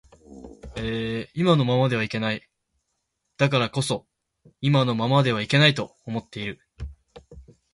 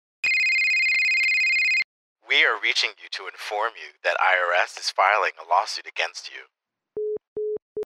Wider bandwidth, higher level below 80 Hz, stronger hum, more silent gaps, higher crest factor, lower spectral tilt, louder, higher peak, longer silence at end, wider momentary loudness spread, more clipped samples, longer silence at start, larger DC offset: second, 11.5 kHz vs 15.5 kHz; first, -50 dBFS vs -76 dBFS; neither; second, none vs 1.84-2.16 s, 7.28-7.36 s, 7.62-7.76 s; about the same, 20 dB vs 20 dB; first, -6 dB/octave vs 1 dB/octave; about the same, -23 LUFS vs -21 LUFS; about the same, -4 dBFS vs -4 dBFS; first, 0.3 s vs 0 s; first, 17 LU vs 14 LU; neither; about the same, 0.3 s vs 0.25 s; neither